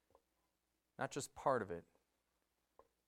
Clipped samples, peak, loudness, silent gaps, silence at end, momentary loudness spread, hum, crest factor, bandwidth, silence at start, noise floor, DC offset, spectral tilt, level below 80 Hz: under 0.1%; -22 dBFS; -43 LUFS; none; 1.25 s; 13 LU; none; 24 dB; 16 kHz; 1 s; -87 dBFS; under 0.1%; -4.5 dB/octave; -78 dBFS